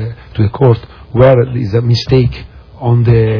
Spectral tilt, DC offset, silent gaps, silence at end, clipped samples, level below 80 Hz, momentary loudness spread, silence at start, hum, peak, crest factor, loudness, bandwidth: -8.5 dB/octave; under 0.1%; none; 0 s; 0.8%; -32 dBFS; 11 LU; 0 s; none; 0 dBFS; 12 dB; -12 LUFS; 5.4 kHz